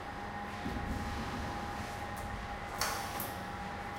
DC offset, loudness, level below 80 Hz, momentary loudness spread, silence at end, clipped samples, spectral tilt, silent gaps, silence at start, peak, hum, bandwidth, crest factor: under 0.1%; -39 LUFS; -48 dBFS; 6 LU; 0 s; under 0.1%; -4 dB/octave; none; 0 s; -18 dBFS; none; 16 kHz; 22 dB